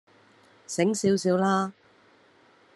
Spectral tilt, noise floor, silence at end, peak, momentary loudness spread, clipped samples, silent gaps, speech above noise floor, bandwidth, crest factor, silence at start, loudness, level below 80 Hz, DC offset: -5.5 dB/octave; -59 dBFS; 1.05 s; -10 dBFS; 10 LU; under 0.1%; none; 35 dB; 12 kHz; 18 dB; 0.7 s; -25 LUFS; -72 dBFS; under 0.1%